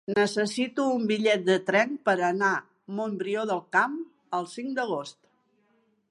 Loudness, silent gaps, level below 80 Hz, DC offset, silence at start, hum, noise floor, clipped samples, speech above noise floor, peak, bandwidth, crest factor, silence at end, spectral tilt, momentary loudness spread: -27 LUFS; none; -78 dBFS; under 0.1%; 0.1 s; none; -68 dBFS; under 0.1%; 42 dB; -10 dBFS; 11.5 kHz; 18 dB; 1 s; -4.5 dB/octave; 10 LU